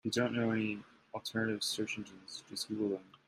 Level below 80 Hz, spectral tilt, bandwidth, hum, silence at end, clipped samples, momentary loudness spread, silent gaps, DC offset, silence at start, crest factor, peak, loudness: -74 dBFS; -4 dB/octave; 13.5 kHz; none; 0.25 s; under 0.1%; 13 LU; none; under 0.1%; 0.05 s; 18 dB; -18 dBFS; -37 LUFS